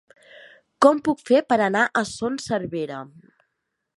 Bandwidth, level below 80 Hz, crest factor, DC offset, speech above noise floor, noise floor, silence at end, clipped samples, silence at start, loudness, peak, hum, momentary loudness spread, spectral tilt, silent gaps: 11.5 kHz; -62 dBFS; 20 dB; under 0.1%; 56 dB; -78 dBFS; 0.9 s; under 0.1%; 0.8 s; -21 LUFS; -2 dBFS; none; 12 LU; -5 dB/octave; none